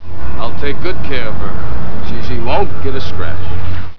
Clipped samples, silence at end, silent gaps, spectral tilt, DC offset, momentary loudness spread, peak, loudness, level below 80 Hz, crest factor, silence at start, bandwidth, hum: under 0.1%; 0 s; none; -7.5 dB/octave; 70%; 6 LU; 0 dBFS; -22 LUFS; -28 dBFS; 12 dB; 0 s; 5.4 kHz; none